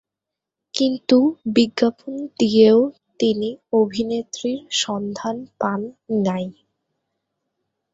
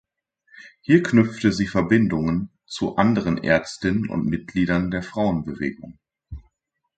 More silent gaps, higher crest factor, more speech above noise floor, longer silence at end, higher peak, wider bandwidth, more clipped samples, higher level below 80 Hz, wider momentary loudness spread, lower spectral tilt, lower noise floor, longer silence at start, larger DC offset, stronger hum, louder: neither; about the same, 20 dB vs 20 dB; first, 66 dB vs 54 dB; first, 1.4 s vs 0.6 s; about the same, -2 dBFS vs -2 dBFS; second, 8 kHz vs 9 kHz; neither; second, -62 dBFS vs -46 dBFS; second, 13 LU vs 16 LU; second, -5 dB/octave vs -7 dB/octave; first, -85 dBFS vs -75 dBFS; first, 0.75 s vs 0.55 s; neither; neither; about the same, -20 LUFS vs -22 LUFS